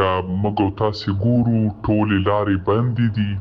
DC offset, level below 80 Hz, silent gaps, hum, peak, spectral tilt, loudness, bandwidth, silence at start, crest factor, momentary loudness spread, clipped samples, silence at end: under 0.1%; -44 dBFS; none; none; -4 dBFS; -9 dB/octave; -19 LUFS; 6.2 kHz; 0 s; 14 dB; 4 LU; under 0.1%; 0 s